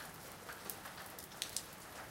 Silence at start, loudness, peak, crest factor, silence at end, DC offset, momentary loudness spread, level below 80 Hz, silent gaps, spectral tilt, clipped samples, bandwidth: 0 s; -46 LUFS; -18 dBFS; 32 dB; 0 s; under 0.1%; 8 LU; -70 dBFS; none; -1.5 dB/octave; under 0.1%; 17 kHz